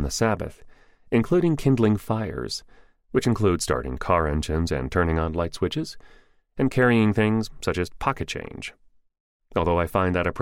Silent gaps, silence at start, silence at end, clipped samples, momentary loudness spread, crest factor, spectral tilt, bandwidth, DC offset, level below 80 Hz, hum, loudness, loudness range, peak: 9.20-9.40 s; 0 s; 0 s; under 0.1%; 11 LU; 18 dB; -6 dB/octave; 16 kHz; under 0.1%; -38 dBFS; none; -24 LUFS; 2 LU; -6 dBFS